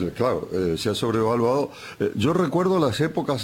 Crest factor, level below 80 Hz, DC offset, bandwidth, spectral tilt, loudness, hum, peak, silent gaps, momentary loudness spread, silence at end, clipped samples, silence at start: 16 dB; -52 dBFS; under 0.1%; 17 kHz; -6 dB/octave; -23 LUFS; none; -8 dBFS; none; 5 LU; 0 s; under 0.1%; 0 s